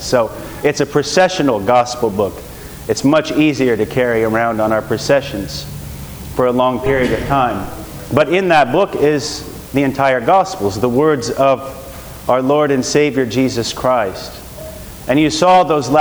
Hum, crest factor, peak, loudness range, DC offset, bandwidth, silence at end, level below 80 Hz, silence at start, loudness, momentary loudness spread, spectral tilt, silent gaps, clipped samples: none; 16 dB; 0 dBFS; 2 LU; under 0.1%; over 20 kHz; 0 s; -38 dBFS; 0 s; -15 LUFS; 16 LU; -5 dB/octave; none; under 0.1%